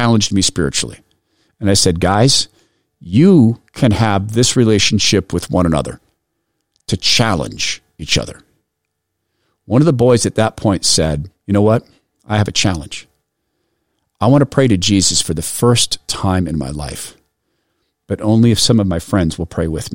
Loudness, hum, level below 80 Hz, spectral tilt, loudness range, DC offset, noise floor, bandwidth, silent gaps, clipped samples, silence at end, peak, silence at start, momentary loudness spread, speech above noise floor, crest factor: -14 LUFS; none; -38 dBFS; -4.5 dB/octave; 5 LU; 0.6%; -74 dBFS; 16.5 kHz; none; under 0.1%; 0 s; -2 dBFS; 0 s; 12 LU; 60 dB; 14 dB